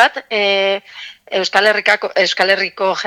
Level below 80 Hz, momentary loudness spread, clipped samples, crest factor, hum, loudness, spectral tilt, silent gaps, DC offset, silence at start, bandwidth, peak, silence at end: -64 dBFS; 10 LU; under 0.1%; 16 dB; none; -15 LUFS; -2 dB/octave; none; under 0.1%; 0 s; 17 kHz; 0 dBFS; 0 s